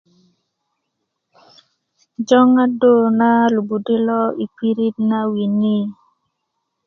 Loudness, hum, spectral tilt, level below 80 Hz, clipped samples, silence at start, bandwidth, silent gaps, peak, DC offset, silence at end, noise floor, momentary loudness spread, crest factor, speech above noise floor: -16 LUFS; none; -7 dB/octave; -66 dBFS; under 0.1%; 2.2 s; 6.8 kHz; none; 0 dBFS; under 0.1%; 0.95 s; -75 dBFS; 9 LU; 18 dB; 60 dB